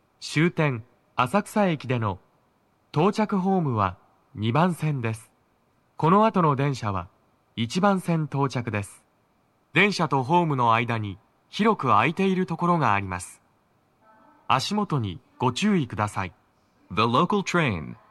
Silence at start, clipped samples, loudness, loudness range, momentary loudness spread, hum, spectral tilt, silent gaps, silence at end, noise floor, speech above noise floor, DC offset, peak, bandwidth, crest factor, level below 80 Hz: 0.2 s; under 0.1%; -24 LUFS; 4 LU; 13 LU; none; -6 dB/octave; none; 0.15 s; -66 dBFS; 42 dB; under 0.1%; -4 dBFS; 12.5 kHz; 20 dB; -62 dBFS